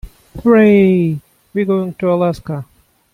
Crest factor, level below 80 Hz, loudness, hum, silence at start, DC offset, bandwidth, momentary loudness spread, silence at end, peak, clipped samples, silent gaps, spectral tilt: 12 dB; -42 dBFS; -14 LUFS; none; 0.05 s; under 0.1%; 12 kHz; 16 LU; 0.5 s; -2 dBFS; under 0.1%; none; -9 dB/octave